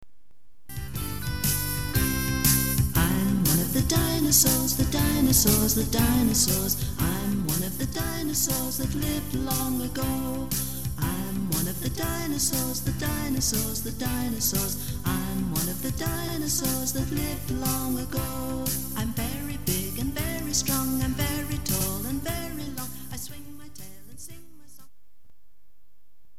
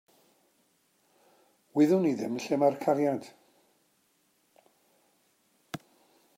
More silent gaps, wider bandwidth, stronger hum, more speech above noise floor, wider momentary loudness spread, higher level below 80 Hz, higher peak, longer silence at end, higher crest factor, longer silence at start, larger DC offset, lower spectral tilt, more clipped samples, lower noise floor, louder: neither; first, 17.5 kHz vs 15.5 kHz; neither; second, 40 dB vs 44 dB; second, 11 LU vs 20 LU; first, -38 dBFS vs -82 dBFS; first, -4 dBFS vs -12 dBFS; first, 2 s vs 0.6 s; about the same, 22 dB vs 20 dB; second, 0.7 s vs 1.75 s; first, 1% vs under 0.1%; second, -4 dB/octave vs -7 dB/octave; neither; second, -66 dBFS vs -71 dBFS; about the same, -26 LUFS vs -28 LUFS